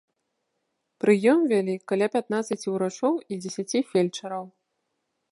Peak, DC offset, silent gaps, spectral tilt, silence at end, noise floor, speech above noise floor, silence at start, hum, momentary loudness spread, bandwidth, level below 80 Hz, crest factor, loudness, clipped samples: -6 dBFS; under 0.1%; none; -5.5 dB/octave; 0.85 s; -78 dBFS; 54 dB; 1.05 s; none; 13 LU; 11.5 kHz; -78 dBFS; 20 dB; -25 LUFS; under 0.1%